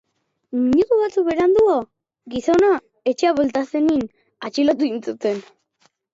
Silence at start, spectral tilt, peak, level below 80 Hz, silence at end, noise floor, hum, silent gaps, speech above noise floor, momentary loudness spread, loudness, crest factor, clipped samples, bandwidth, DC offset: 0.5 s; -5.5 dB/octave; -6 dBFS; -54 dBFS; 0.7 s; -63 dBFS; none; none; 45 dB; 12 LU; -19 LUFS; 14 dB; under 0.1%; 7.8 kHz; under 0.1%